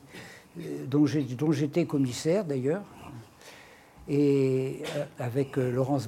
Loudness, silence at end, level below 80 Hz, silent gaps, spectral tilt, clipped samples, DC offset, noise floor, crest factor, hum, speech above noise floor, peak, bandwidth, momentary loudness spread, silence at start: -28 LUFS; 0 s; -66 dBFS; none; -7 dB/octave; under 0.1%; under 0.1%; -52 dBFS; 14 dB; none; 25 dB; -14 dBFS; 15.5 kHz; 21 LU; 0.05 s